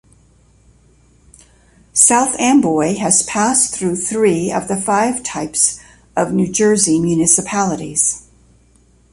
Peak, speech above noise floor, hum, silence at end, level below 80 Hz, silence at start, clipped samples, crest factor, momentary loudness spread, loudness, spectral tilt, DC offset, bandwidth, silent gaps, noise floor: 0 dBFS; 36 dB; none; 0.9 s; -50 dBFS; 1.95 s; under 0.1%; 16 dB; 8 LU; -14 LUFS; -3.5 dB/octave; under 0.1%; 13 kHz; none; -51 dBFS